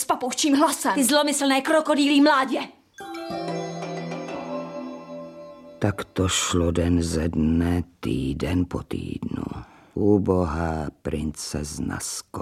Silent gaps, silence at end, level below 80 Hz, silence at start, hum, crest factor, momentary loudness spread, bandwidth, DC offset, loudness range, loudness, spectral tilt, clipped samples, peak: none; 0 s; -42 dBFS; 0 s; none; 18 dB; 16 LU; 15.5 kHz; under 0.1%; 9 LU; -24 LUFS; -4.5 dB/octave; under 0.1%; -6 dBFS